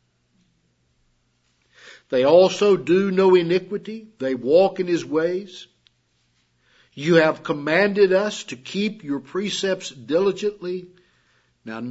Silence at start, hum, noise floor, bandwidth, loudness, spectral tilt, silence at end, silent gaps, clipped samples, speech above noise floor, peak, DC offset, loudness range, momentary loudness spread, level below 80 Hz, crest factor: 1.85 s; 60 Hz at -55 dBFS; -66 dBFS; 8 kHz; -20 LUFS; -5.5 dB/octave; 0 s; none; under 0.1%; 46 dB; -2 dBFS; under 0.1%; 6 LU; 15 LU; -70 dBFS; 20 dB